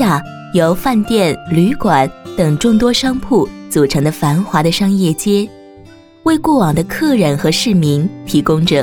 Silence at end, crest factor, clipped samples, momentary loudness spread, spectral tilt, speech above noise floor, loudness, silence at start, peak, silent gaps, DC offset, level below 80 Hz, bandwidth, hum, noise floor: 0 s; 12 dB; under 0.1%; 5 LU; -5.5 dB/octave; 27 dB; -14 LUFS; 0 s; 0 dBFS; none; under 0.1%; -38 dBFS; 18.5 kHz; none; -40 dBFS